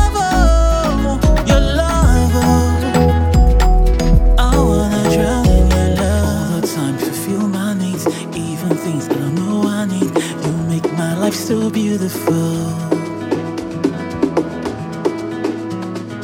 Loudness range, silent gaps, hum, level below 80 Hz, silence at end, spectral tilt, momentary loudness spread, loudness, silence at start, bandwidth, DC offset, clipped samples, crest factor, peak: 6 LU; none; none; -18 dBFS; 0 s; -6 dB/octave; 8 LU; -16 LUFS; 0 s; 17.5 kHz; under 0.1%; under 0.1%; 14 dB; 0 dBFS